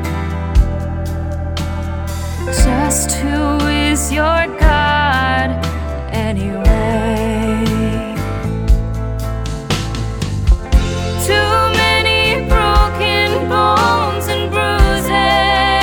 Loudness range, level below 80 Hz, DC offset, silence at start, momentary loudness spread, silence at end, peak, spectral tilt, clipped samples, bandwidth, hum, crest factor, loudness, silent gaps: 5 LU; -20 dBFS; under 0.1%; 0 s; 10 LU; 0 s; 0 dBFS; -4.5 dB/octave; under 0.1%; 19 kHz; none; 14 dB; -15 LUFS; none